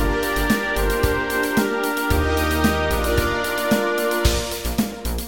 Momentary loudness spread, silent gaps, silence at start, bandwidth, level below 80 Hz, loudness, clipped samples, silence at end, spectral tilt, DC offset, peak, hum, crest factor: 4 LU; none; 0 s; 17 kHz; -28 dBFS; -21 LUFS; under 0.1%; 0 s; -4.5 dB/octave; 0.8%; -4 dBFS; none; 16 dB